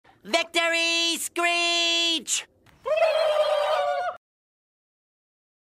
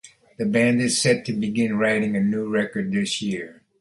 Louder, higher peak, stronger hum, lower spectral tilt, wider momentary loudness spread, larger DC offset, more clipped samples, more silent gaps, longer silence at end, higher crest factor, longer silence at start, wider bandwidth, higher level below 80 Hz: about the same, -23 LUFS vs -22 LUFS; second, -10 dBFS vs -6 dBFS; neither; second, 0.5 dB/octave vs -4.5 dB/octave; about the same, 7 LU vs 9 LU; neither; neither; neither; first, 1.5 s vs 0.3 s; about the same, 16 dB vs 16 dB; first, 0.25 s vs 0.05 s; first, 16 kHz vs 11.5 kHz; second, -72 dBFS vs -60 dBFS